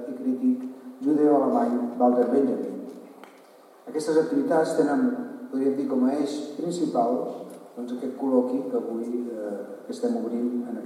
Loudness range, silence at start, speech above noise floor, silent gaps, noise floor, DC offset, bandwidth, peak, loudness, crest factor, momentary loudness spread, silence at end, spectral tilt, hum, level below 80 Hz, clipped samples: 4 LU; 0 s; 27 dB; none; -52 dBFS; under 0.1%; 12.5 kHz; -8 dBFS; -25 LUFS; 16 dB; 13 LU; 0 s; -6.5 dB/octave; none; -88 dBFS; under 0.1%